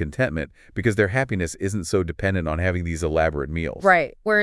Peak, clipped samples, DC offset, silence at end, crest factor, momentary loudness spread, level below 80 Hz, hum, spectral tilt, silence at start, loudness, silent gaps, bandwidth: -4 dBFS; under 0.1%; under 0.1%; 0 s; 18 dB; 9 LU; -40 dBFS; none; -6 dB/octave; 0 s; -23 LUFS; none; 12 kHz